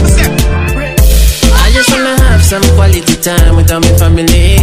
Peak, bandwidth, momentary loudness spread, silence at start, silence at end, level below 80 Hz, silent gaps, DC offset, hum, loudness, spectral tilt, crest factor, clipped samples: 0 dBFS; 16.5 kHz; 3 LU; 0 s; 0 s; -10 dBFS; none; under 0.1%; none; -8 LUFS; -4.5 dB/octave; 6 dB; 1%